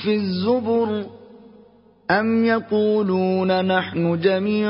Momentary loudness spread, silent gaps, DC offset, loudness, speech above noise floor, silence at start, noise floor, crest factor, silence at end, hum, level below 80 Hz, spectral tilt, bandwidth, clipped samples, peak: 4 LU; none; under 0.1%; -20 LUFS; 32 dB; 0 s; -51 dBFS; 18 dB; 0 s; none; -56 dBFS; -11 dB/octave; 5.6 kHz; under 0.1%; -4 dBFS